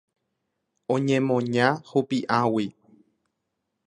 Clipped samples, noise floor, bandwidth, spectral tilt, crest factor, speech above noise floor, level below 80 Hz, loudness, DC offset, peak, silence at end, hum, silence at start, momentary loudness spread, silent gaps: under 0.1%; -80 dBFS; 10.5 kHz; -6.5 dB/octave; 22 dB; 56 dB; -68 dBFS; -24 LUFS; under 0.1%; -4 dBFS; 1.15 s; none; 0.9 s; 6 LU; none